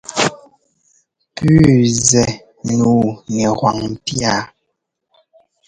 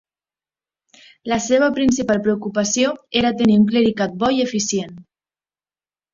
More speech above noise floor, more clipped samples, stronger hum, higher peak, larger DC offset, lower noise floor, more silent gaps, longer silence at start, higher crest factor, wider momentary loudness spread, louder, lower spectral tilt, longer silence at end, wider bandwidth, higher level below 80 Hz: second, 59 dB vs over 72 dB; neither; neither; about the same, 0 dBFS vs -2 dBFS; neither; second, -73 dBFS vs under -90 dBFS; neither; second, 0.1 s vs 1.25 s; about the same, 16 dB vs 18 dB; first, 11 LU vs 8 LU; first, -15 LUFS vs -18 LUFS; about the same, -5 dB/octave vs -4.5 dB/octave; about the same, 1.2 s vs 1.1 s; first, 11 kHz vs 7.6 kHz; first, -42 dBFS vs -52 dBFS